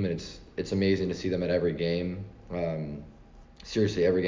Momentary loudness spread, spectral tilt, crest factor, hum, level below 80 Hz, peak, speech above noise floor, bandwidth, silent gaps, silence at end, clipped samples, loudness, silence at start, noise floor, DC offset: 13 LU; -6.5 dB/octave; 16 dB; none; -48 dBFS; -12 dBFS; 22 dB; 7.6 kHz; none; 0 s; under 0.1%; -30 LUFS; 0 s; -51 dBFS; under 0.1%